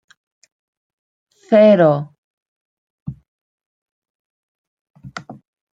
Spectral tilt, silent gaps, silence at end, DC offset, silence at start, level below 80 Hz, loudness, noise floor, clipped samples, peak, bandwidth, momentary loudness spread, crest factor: -8 dB/octave; 2.18-3.06 s, 3.28-3.58 s, 3.66-4.02 s, 4.10-4.94 s; 0.4 s; under 0.1%; 1.5 s; -60 dBFS; -13 LUFS; -36 dBFS; under 0.1%; -2 dBFS; 7.8 kHz; 24 LU; 20 dB